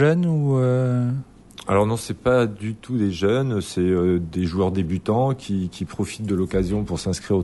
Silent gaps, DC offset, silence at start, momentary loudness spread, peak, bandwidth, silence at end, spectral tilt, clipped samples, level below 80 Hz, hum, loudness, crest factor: none; under 0.1%; 0 s; 8 LU; -6 dBFS; 11.5 kHz; 0 s; -7 dB/octave; under 0.1%; -44 dBFS; none; -22 LUFS; 16 dB